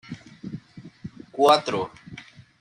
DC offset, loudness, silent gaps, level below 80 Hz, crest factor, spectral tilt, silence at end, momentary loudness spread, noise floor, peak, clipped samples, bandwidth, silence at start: under 0.1%; -22 LUFS; none; -64 dBFS; 22 dB; -4.5 dB/octave; 0.4 s; 24 LU; -45 dBFS; -4 dBFS; under 0.1%; 11.5 kHz; 0.1 s